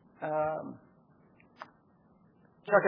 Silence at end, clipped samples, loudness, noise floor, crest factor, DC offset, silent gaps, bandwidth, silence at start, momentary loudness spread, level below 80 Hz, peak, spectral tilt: 0 s; under 0.1%; -33 LUFS; -64 dBFS; 24 dB; under 0.1%; none; 4.8 kHz; 0.2 s; 21 LU; -74 dBFS; -10 dBFS; -5.5 dB/octave